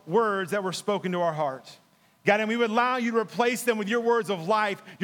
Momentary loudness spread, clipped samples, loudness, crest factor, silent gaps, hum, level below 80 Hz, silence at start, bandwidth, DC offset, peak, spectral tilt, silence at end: 6 LU; under 0.1%; -26 LUFS; 20 dB; none; none; -86 dBFS; 0.05 s; 18.5 kHz; under 0.1%; -6 dBFS; -4.5 dB/octave; 0 s